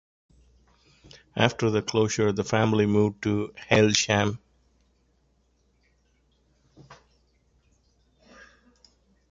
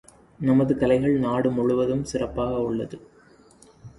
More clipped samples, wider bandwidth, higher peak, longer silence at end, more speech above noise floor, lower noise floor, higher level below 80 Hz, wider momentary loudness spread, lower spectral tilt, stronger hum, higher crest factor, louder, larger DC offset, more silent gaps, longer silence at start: neither; second, 7.8 kHz vs 11.5 kHz; first, -2 dBFS vs -8 dBFS; first, 2.35 s vs 0.1 s; first, 44 dB vs 31 dB; first, -67 dBFS vs -53 dBFS; second, -56 dBFS vs -48 dBFS; about the same, 9 LU vs 8 LU; second, -4.5 dB/octave vs -7.5 dB/octave; neither; first, 26 dB vs 16 dB; about the same, -24 LUFS vs -23 LUFS; neither; neither; first, 1.35 s vs 0.4 s